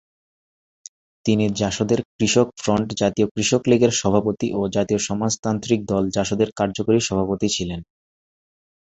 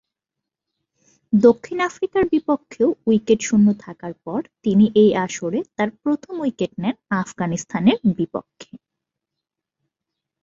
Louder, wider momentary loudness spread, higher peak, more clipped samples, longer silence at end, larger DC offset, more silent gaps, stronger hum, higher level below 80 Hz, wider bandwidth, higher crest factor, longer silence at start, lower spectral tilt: about the same, -21 LUFS vs -20 LUFS; second, 6 LU vs 11 LU; about the same, -2 dBFS vs -2 dBFS; neither; second, 1 s vs 1.65 s; neither; first, 2.05-2.19 s, 3.31-3.35 s, 5.39-5.43 s vs none; neither; first, -48 dBFS vs -56 dBFS; about the same, 8.2 kHz vs 7.6 kHz; about the same, 20 dB vs 18 dB; about the same, 1.25 s vs 1.3 s; about the same, -5 dB/octave vs -6 dB/octave